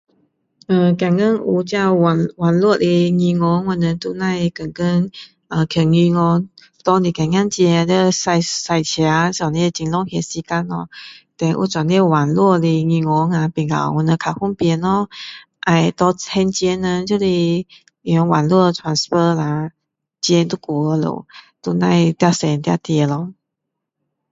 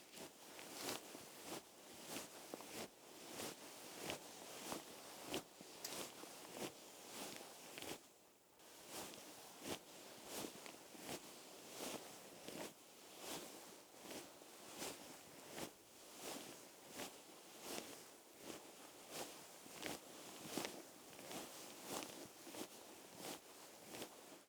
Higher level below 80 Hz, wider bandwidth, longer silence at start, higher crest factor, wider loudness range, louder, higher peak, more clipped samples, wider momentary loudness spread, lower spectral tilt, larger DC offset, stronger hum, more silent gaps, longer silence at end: first, -52 dBFS vs -86 dBFS; second, 7.8 kHz vs over 20 kHz; first, 0.7 s vs 0 s; second, 16 dB vs 30 dB; about the same, 3 LU vs 2 LU; first, -17 LUFS vs -53 LUFS; first, 0 dBFS vs -24 dBFS; neither; about the same, 9 LU vs 9 LU; first, -6 dB/octave vs -2 dB/octave; neither; neither; neither; first, 1 s vs 0 s